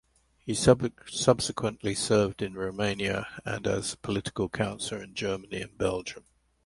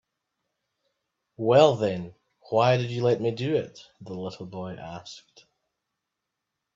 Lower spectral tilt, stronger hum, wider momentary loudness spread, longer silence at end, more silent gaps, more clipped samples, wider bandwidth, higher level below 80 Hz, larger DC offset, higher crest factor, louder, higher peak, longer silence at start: second, -4.5 dB/octave vs -6.5 dB/octave; neither; second, 10 LU vs 23 LU; second, 0.45 s vs 1.55 s; neither; neither; first, 11.5 kHz vs 7.6 kHz; first, -52 dBFS vs -66 dBFS; neither; about the same, 22 dB vs 22 dB; second, -29 LUFS vs -24 LUFS; about the same, -6 dBFS vs -4 dBFS; second, 0.45 s vs 1.4 s